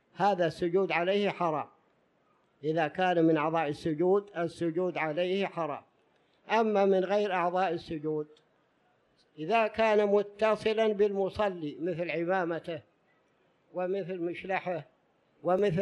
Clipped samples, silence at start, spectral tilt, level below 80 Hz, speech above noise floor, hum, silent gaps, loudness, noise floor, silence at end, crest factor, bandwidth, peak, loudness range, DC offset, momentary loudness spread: under 0.1%; 0.15 s; -7 dB/octave; -68 dBFS; 41 dB; none; none; -30 LUFS; -70 dBFS; 0 s; 18 dB; 11 kHz; -12 dBFS; 5 LU; under 0.1%; 11 LU